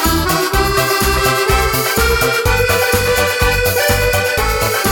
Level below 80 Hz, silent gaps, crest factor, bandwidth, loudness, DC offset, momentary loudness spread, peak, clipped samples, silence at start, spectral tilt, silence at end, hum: -22 dBFS; none; 14 dB; 19.5 kHz; -13 LUFS; 0.2%; 2 LU; 0 dBFS; under 0.1%; 0 s; -3.5 dB/octave; 0 s; none